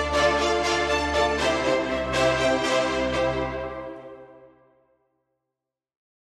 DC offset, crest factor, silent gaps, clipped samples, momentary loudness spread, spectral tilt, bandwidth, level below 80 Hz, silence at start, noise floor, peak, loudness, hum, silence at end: under 0.1%; 18 dB; none; under 0.1%; 13 LU; -4 dB/octave; 14 kHz; -42 dBFS; 0 s; -86 dBFS; -8 dBFS; -23 LUFS; none; 1.9 s